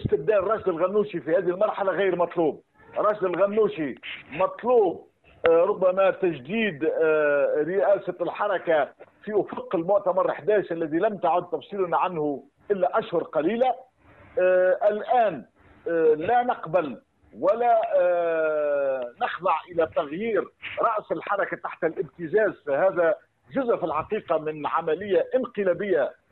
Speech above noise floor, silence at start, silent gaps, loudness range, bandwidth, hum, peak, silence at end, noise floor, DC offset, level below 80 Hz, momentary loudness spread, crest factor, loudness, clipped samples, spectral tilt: 29 dB; 0 s; none; 3 LU; 4.2 kHz; none; -4 dBFS; 0.2 s; -53 dBFS; under 0.1%; -62 dBFS; 8 LU; 20 dB; -24 LUFS; under 0.1%; -9 dB/octave